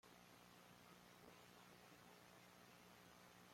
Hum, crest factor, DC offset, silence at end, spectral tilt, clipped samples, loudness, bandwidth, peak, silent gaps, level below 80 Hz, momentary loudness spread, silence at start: 60 Hz at -75 dBFS; 18 dB; under 0.1%; 0 s; -3.5 dB/octave; under 0.1%; -66 LUFS; 16.5 kHz; -50 dBFS; none; -88 dBFS; 1 LU; 0.05 s